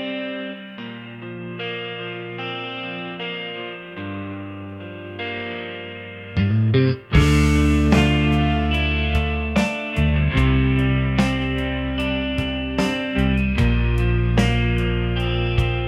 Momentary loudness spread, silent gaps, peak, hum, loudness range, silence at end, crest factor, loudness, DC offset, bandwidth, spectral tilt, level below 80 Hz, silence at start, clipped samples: 15 LU; none; -2 dBFS; none; 11 LU; 0 s; 18 dB; -21 LUFS; under 0.1%; 12.5 kHz; -6.5 dB/octave; -28 dBFS; 0 s; under 0.1%